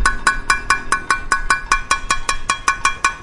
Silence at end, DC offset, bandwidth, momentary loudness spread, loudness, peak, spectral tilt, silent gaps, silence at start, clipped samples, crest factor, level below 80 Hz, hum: 0 s; under 0.1%; 11.5 kHz; 2 LU; -18 LUFS; 0 dBFS; -1 dB/octave; none; 0 s; under 0.1%; 18 dB; -28 dBFS; none